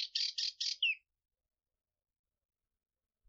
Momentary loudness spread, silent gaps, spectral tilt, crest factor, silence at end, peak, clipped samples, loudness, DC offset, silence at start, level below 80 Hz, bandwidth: 3 LU; none; 9.5 dB/octave; 20 dB; 2.3 s; -22 dBFS; under 0.1%; -35 LUFS; under 0.1%; 0 s; under -90 dBFS; 7.6 kHz